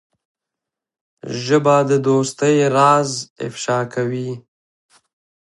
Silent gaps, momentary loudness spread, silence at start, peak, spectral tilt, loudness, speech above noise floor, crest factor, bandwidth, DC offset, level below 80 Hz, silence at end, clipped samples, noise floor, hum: 3.30-3.36 s; 15 LU; 1.25 s; 0 dBFS; -5.5 dB/octave; -17 LUFS; 68 dB; 18 dB; 11.5 kHz; under 0.1%; -66 dBFS; 1 s; under 0.1%; -85 dBFS; none